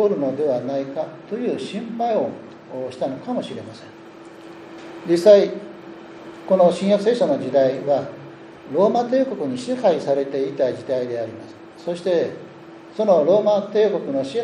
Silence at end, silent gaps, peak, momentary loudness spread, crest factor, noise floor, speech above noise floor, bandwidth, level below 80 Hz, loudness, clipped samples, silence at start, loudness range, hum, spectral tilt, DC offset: 0 s; none; -2 dBFS; 23 LU; 20 dB; -41 dBFS; 21 dB; 11 kHz; -70 dBFS; -20 LUFS; under 0.1%; 0 s; 8 LU; none; -6.5 dB/octave; under 0.1%